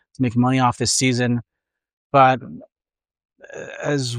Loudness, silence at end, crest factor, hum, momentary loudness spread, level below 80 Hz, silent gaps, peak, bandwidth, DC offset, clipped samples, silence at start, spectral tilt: -19 LUFS; 0 s; 20 dB; none; 20 LU; -58 dBFS; 1.93-2.10 s, 3.25-3.29 s; -2 dBFS; 14.5 kHz; under 0.1%; under 0.1%; 0.2 s; -4.5 dB/octave